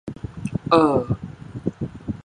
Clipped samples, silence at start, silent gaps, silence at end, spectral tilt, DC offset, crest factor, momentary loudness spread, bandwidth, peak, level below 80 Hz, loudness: under 0.1%; 0.05 s; none; 0.05 s; -8 dB/octave; under 0.1%; 22 dB; 16 LU; 10.5 kHz; 0 dBFS; -44 dBFS; -23 LUFS